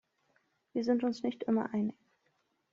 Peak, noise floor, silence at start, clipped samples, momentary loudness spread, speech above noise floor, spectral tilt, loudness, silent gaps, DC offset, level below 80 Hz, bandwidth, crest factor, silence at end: -18 dBFS; -77 dBFS; 0.75 s; under 0.1%; 6 LU; 45 dB; -6 dB/octave; -34 LUFS; none; under 0.1%; -78 dBFS; 7.4 kHz; 16 dB; 0.8 s